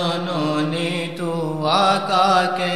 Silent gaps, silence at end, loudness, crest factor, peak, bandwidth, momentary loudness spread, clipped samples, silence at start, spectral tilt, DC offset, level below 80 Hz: none; 0 s; -19 LUFS; 16 dB; -4 dBFS; 14 kHz; 8 LU; under 0.1%; 0 s; -5 dB/octave; 0.7%; -64 dBFS